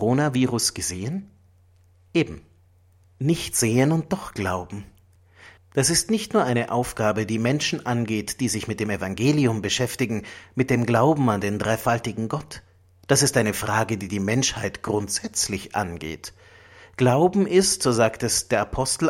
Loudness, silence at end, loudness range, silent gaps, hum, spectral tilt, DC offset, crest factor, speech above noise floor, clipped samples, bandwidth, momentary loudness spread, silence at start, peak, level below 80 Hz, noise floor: -23 LUFS; 0 s; 3 LU; none; none; -4.5 dB/octave; under 0.1%; 20 dB; 34 dB; under 0.1%; 16.5 kHz; 11 LU; 0 s; -4 dBFS; -50 dBFS; -57 dBFS